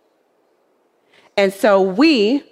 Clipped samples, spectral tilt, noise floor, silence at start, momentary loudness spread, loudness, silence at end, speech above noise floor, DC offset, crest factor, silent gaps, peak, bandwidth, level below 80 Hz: under 0.1%; -5 dB/octave; -61 dBFS; 1.35 s; 5 LU; -15 LUFS; 0.15 s; 47 dB; under 0.1%; 16 dB; none; -2 dBFS; 15 kHz; -68 dBFS